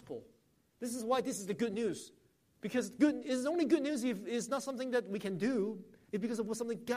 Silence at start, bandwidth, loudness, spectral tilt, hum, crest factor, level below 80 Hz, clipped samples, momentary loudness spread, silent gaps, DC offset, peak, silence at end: 0.05 s; 15 kHz; -36 LUFS; -5 dB/octave; none; 18 dB; -76 dBFS; under 0.1%; 14 LU; none; under 0.1%; -18 dBFS; 0 s